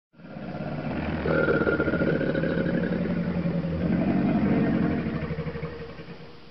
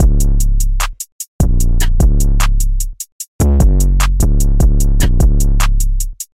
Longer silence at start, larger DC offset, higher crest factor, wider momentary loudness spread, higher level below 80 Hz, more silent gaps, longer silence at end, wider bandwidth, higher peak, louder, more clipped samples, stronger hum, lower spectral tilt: about the same, 0.1 s vs 0 s; first, 0.4% vs under 0.1%; first, 16 dB vs 10 dB; first, 16 LU vs 9 LU; second, -44 dBFS vs -12 dBFS; second, none vs 1.12-1.19 s, 1.28-1.39 s, 3.12-3.20 s, 3.28-3.39 s; second, 0 s vs 0.15 s; second, 5.8 kHz vs 15.5 kHz; second, -10 dBFS vs 0 dBFS; second, -26 LUFS vs -15 LUFS; neither; neither; first, -10 dB/octave vs -5 dB/octave